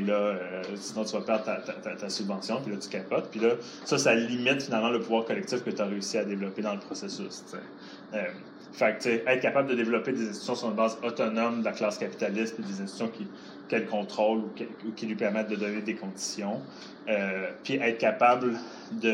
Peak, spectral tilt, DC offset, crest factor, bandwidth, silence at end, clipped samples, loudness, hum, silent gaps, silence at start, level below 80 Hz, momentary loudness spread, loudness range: -8 dBFS; -4.5 dB/octave; under 0.1%; 20 dB; 12 kHz; 0 s; under 0.1%; -30 LUFS; none; none; 0 s; -82 dBFS; 12 LU; 4 LU